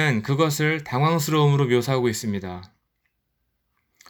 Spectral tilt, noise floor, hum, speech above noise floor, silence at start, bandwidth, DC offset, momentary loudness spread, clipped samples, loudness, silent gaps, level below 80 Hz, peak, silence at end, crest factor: -5.5 dB/octave; -74 dBFS; none; 53 dB; 0 s; over 20 kHz; under 0.1%; 11 LU; under 0.1%; -22 LUFS; none; -62 dBFS; -6 dBFS; 1.45 s; 16 dB